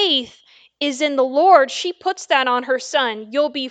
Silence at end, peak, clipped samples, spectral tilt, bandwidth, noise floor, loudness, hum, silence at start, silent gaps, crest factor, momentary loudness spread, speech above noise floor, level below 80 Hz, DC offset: 0 s; 0 dBFS; under 0.1%; -1 dB/octave; 9.2 kHz; -51 dBFS; -18 LUFS; none; 0 s; none; 18 dB; 11 LU; 33 dB; -72 dBFS; under 0.1%